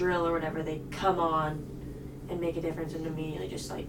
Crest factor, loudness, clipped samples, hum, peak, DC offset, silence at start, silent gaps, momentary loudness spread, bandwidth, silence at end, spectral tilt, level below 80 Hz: 18 dB; -32 LUFS; under 0.1%; none; -14 dBFS; under 0.1%; 0 s; none; 13 LU; 18.5 kHz; 0 s; -6 dB/octave; -48 dBFS